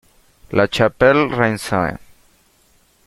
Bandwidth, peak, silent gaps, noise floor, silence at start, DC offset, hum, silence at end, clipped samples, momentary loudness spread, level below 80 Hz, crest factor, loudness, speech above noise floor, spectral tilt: 14.5 kHz; -2 dBFS; none; -56 dBFS; 0.5 s; under 0.1%; none; 1.1 s; under 0.1%; 9 LU; -46 dBFS; 18 dB; -17 LUFS; 40 dB; -5.5 dB/octave